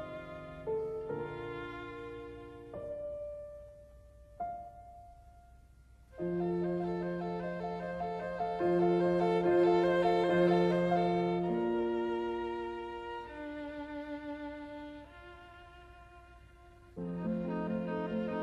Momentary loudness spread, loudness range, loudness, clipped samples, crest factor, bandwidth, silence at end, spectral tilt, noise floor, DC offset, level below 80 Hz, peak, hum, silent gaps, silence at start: 22 LU; 17 LU; -34 LUFS; under 0.1%; 18 dB; 7.8 kHz; 0 s; -8 dB/octave; -59 dBFS; under 0.1%; -60 dBFS; -16 dBFS; none; none; 0 s